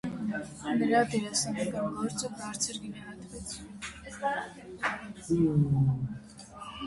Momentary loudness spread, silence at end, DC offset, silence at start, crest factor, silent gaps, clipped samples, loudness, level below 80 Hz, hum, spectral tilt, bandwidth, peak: 17 LU; 0 s; under 0.1%; 0.05 s; 20 dB; none; under 0.1%; -31 LUFS; -56 dBFS; none; -5 dB/octave; 11.5 kHz; -12 dBFS